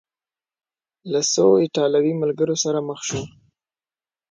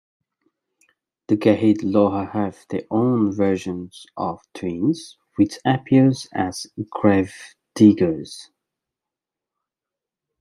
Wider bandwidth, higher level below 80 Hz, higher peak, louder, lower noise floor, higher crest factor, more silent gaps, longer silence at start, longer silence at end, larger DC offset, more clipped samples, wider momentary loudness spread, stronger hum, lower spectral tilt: second, 9.4 kHz vs 11.5 kHz; about the same, -60 dBFS vs -62 dBFS; second, -6 dBFS vs -2 dBFS; about the same, -20 LUFS vs -20 LUFS; about the same, under -90 dBFS vs -87 dBFS; about the same, 18 dB vs 20 dB; neither; second, 1.05 s vs 1.3 s; second, 1.05 s vs 1.95 s; neither; neither; second, 11 LU vs 15 LU; neither; second, -4.5 dB/octave vs -7 dB/octave